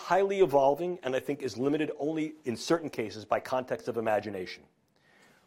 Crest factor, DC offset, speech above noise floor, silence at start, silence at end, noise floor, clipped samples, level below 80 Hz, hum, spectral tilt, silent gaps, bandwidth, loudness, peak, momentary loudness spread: 18 dB; under 0.1%; 34 dB; 0 s; 0.9 s; -64 dBFS; under 0.1%; -68 dBFS; none; -5.5 dB/octave; none; 16.5 kHz; -30 LUFS; -12 dBFS; 12 LU